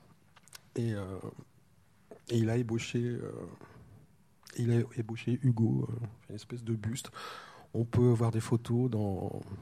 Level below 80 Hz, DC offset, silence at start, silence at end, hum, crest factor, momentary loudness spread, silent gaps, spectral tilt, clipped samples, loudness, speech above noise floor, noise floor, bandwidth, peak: -64 dBFS; under 0.1%; 0.55 s; 0 s; none; 18 dB; 17 LU; none; -7.5 dB/octave; under 0.1%; -33 LUFS; 34 dB; -66 dBFS; 13 kHz; -16 dBFS